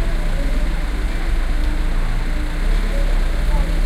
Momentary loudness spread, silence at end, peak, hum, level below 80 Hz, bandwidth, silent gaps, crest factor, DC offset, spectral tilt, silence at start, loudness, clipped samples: 2 LU; 0 s; -6 dBFS; none; -16 dBFS; 11 kHz; none; 10 dB; under 0.1%; -5.5 dB/octave; 0 s; -23 LUFS; under 0.1%